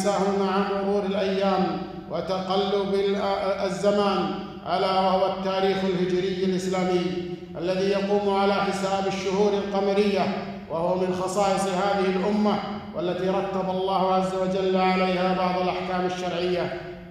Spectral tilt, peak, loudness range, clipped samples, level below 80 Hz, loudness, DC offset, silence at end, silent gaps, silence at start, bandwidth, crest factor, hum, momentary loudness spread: -6 dB/octave; -8 dBFS; 1 LU; under 0.1%; -54 dBFS; -25 LUFS; under 0.1%; 0 s; none; 0 s; 12 kHz; 16 dB; none; 6 LU